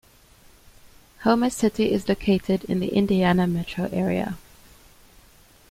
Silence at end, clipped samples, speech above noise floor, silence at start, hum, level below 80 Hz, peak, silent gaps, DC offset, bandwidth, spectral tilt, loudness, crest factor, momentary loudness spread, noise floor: 1.3 s; under 0.1%; 31 dB; 0.85 s; none; -48 dBFS; -4 dBFS; none; under 0.1%; 16 kHz; -6.5 dB/octave; -23 LUFS; 20 dB; 7 LU; -53 dBFS